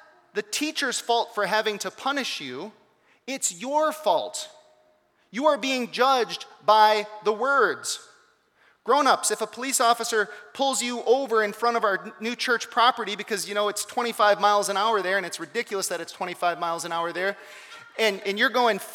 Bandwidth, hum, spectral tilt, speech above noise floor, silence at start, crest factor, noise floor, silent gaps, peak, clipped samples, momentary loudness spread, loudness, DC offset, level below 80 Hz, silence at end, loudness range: 19 kHz; none; -1.5 dB/octave; 39 dB; 0.35 s; 20 dB; -64 dBFS; none; -6 dBFS; under 0.1%; 12 LU; -24 LUFS; under 0.1%; -86 dBFS; 0 s; 5 LU